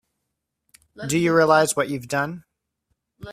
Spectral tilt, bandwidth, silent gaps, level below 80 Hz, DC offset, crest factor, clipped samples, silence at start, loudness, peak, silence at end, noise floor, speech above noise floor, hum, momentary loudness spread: -4.5 dB/octave; 16 kHz; none; -60 dBFS; under 0.1%; 20 dB; under 0.1%; 1 s; -20 LUFS; -2 dBFS; 0 s; -80 dBFS; 59 dB; none; 16 LU